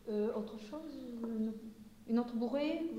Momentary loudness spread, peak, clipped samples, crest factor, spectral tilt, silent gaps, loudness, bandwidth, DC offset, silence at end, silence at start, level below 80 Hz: 12 LU; -24 dBFS; under 0.1%; 16 dB; -7 dB/octave; none; -39 LUFS; 15 kHz; under 0.1%; 0 s; 0 s; -68 dBFS